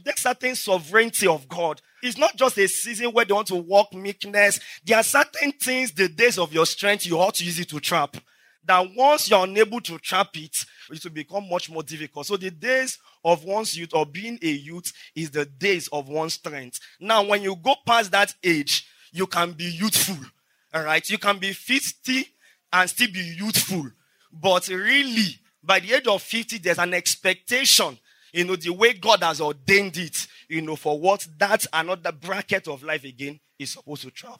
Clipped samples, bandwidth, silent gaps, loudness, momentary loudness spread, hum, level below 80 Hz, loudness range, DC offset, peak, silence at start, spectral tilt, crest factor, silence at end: under 0.1%; 16 kHz; none; -22 LUFS; 13 LU; none; -76 dBFS; 6 LU; under 0.1%; -2 dBFS; 0.05 s; -2.5 dB/octave; 20 dB; 0.05 s